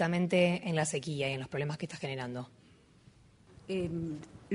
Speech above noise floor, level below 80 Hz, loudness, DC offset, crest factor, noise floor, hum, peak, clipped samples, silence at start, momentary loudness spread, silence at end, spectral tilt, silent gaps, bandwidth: 28 dB; -64 dBFS; -34 LUFS; under 0.1%; 20 dB; -61 dBFS; none; -14 dBFS; under 0.1%; 0 s; 15 LU; 0 s; -5.5 dB/octave; none; 10.5 kHz